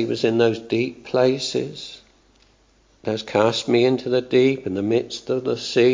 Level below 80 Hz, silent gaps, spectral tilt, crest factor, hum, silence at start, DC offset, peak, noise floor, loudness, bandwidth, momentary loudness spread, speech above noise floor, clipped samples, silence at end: -58 dBFS; none; -5.5 dB/octave; 18 dB; none; 0 s; under 0.1%; -2 dBFS; -58 dBFS; -21 LUFS; 7.6 kHz; 9 LU; 38 dB; under 0.1%; 0 s